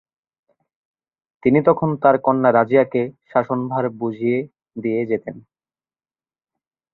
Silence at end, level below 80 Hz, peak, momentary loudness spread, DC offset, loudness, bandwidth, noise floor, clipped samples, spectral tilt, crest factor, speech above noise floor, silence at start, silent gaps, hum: 1.55 s; -60 dBFS; -2 dBFS; 9 LU; under 0.1%; -19 LUFS; 4.2 kHz; under -90 dBFS; under 0.1%; -11 dB/octave; 18 dB; over 72 dB; 1.45 s; none; none